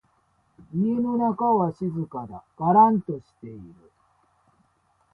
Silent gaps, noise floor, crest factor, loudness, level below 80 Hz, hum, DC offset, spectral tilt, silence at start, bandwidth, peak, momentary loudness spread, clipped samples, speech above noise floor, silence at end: none; -66 dBFS; 20 dB; -23 LUFS; -62 dBFS; none; under 0.1%; -11.5 dB/octave; 0.75 s; 5 kHz; -6 dBFS; 24 LU; under 0.1%; 43 dB; 1.45 s